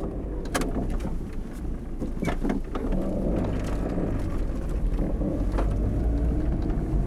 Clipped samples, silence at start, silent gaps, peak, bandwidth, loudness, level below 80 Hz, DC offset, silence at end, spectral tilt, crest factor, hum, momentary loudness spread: under 0.1%; 0 s; none; -10 dBFS; 13.5 kHz; -29 LUFS; -28 dBFS; under 0.1%; 0 s; -7.5 dB/octave; 16 dB; none; 7 LU